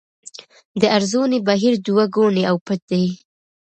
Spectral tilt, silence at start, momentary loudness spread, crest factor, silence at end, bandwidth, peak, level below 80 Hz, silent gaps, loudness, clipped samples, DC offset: -5.5 dB/octave; 0.75 s; 20 LU; 18 dB; 0.55 s; 8.8 kHz; 0 dBFS; -64 dBFS; 2.61-2.66 s, 2.82-2.88 s; -18 LUFS; under 0.1%; under 0.1%